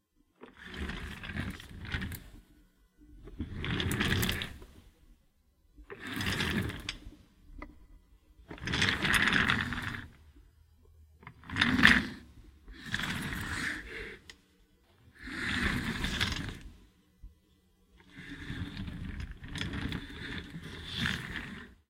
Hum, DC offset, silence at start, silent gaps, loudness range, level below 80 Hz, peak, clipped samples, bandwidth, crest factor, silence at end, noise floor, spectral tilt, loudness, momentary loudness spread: none; under 0.1%; 0.4 s; none; 12 LU; -48 dBFS; -2 dBFS; under 0.1%; 16.5 kHz; 34 dB; 0.15 s; -68 dBFS; -4 dB/octave; -32 LUFS; 24 LU